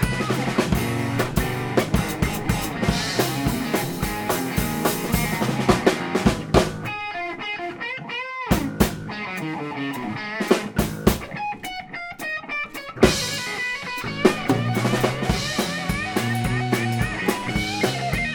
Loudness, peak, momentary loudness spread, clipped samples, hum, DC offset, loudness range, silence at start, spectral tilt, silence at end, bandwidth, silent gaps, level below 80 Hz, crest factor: -23 LUFS; 0 dBFS; 8 LU; under 0.1%; none; under 0.1%; 4 LU; 0 s; -5 dB/octave; 0 s; 18 kHz; none; -36 dBFS; 24 dB